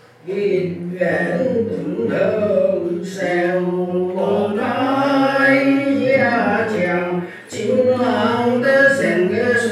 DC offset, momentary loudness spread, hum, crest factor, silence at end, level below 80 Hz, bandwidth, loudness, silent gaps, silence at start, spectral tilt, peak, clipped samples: under 0.1%; 9 LU; none; 16 dB; 0 s; -68 dBFS; 13 kHz; -17 LUFS; none; 0.25 s; -6 dB/octave; -2 dBFS; under 0.1%